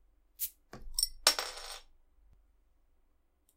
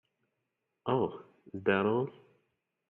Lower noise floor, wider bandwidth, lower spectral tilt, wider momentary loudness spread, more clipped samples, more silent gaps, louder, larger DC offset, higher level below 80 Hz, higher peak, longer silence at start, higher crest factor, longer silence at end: second, -71 dBFS vs -84 dBFS; first, 16.5 kHz vs 4.1 kHz; second, 1 dB/octave vs -9.5 dB/octave; about the same, 18 LU vs 16 LU; neither; neither; about the same, -32 LUFS vs -32 LUFS; neither; first, -54 dBFS vs -74 dBFS; first, -8 dBFS vs -14 dBFS; second, 0.4 s vs 0.85 s; first, 32 dB vs 20 dB; first, 1.7 s vs 0.8 s